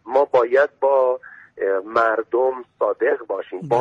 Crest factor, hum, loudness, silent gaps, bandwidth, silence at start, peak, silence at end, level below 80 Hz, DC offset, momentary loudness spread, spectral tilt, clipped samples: 14 dB; none; -20 LUFS; none; 6.6 kHz; 0.05 s; -6 dBFS; 0 s; -68 dBFS; under 0.1%; 9 LU; -6.5 dB/octave; under 0.1%